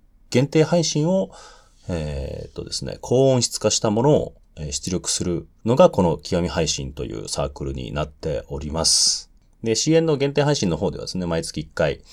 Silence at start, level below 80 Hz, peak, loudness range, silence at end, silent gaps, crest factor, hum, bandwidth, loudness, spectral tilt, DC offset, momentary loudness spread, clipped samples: 0.3 s; -40 dBFS; -2 dBFS; 2 LU; 0.15 s; none; 20 dB; none; 15.5 kHz; -21 LUFS; -4.5 dB/octave; under 0.1%; 14 LU; under 0.1%